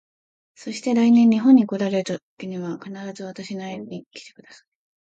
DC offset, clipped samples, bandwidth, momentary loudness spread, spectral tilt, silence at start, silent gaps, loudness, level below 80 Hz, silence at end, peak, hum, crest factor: under 0.1%; under 0.1%; 8 kHz; 21 LU; -6.5 dB/octave; 0.6 s; 2.23-2.37 s, 4.06-4.11 s; -19 LUFS; -72 dBFS; 0.75 s; -4 dBFS; none; 18 dB